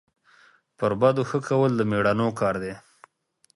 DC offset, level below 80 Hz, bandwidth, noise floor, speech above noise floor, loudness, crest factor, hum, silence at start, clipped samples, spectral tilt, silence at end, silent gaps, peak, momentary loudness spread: under 0.1%; -58 dBFS; 11.5 kHz; -66 dBFS; 43 dB; -24 LUFS; 18 dB; none; 0.8 s; under 0.1%; -7 dB/octave; 0.75 s; none; -6 dBFS; 9 LU